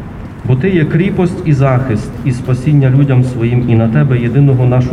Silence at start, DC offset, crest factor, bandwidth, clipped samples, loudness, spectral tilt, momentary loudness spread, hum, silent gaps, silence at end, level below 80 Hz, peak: 0 s; under 0.1%; 10 dB; 9.8 kHz; under 0.1%; -12 LUFS; -9 dB/octave; 7 LU; none; none; 0 s; -32 dBFS; 0 dBFS